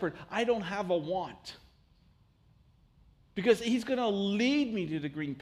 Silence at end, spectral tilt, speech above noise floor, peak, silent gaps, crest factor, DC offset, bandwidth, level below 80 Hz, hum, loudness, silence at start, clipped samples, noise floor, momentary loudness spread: 0 s; -5.5 dB/octave; 34 dB; -12 dBFS; none; 20 dB; under 0.1%; 14 kHz; -64 dBFS; none; -31 LUFS; 0 s; under 0.1%; -64 dBFS; 11 LU